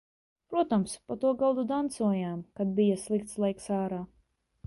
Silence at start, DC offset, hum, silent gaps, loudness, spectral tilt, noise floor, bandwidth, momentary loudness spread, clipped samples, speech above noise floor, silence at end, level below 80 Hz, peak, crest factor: 0.5 s; under 0.1%; none; none; -30 LUFS; -6.5 dB/octave; -70 dBFS; 11.5 kHz; 8 LU; under 0.1%; 41 dB; 0.6 s; -64 dBFS; -16 dBFS; 14 dB